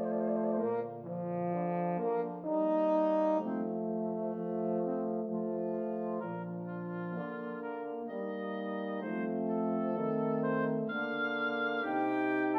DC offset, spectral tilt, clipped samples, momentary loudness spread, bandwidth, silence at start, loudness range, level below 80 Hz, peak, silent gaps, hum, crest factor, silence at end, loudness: under 0.1%; -9.5 dB/octave; under 0.1%; 9 LU; 6 kHz; 0 s; 6 LU; -84 dBFS; -20 dBFS; none; none; 14 dB; 0 s; -34 LUFS